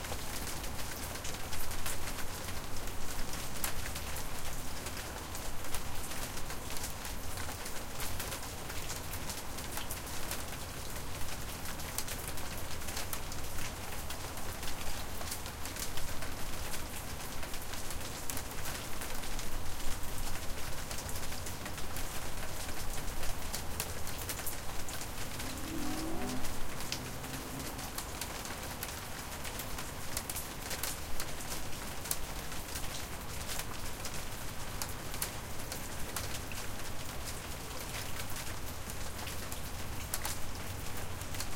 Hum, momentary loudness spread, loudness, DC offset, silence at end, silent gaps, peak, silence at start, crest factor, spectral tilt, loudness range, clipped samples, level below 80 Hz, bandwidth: none; 4 LU; -40 LUFS; under 0.1%; 0 s; none; -12 dBFS; 0 s; 24 dB; -3 dB/octave; 1 LU; under 0.1%; -44 dBFS; 17 kHz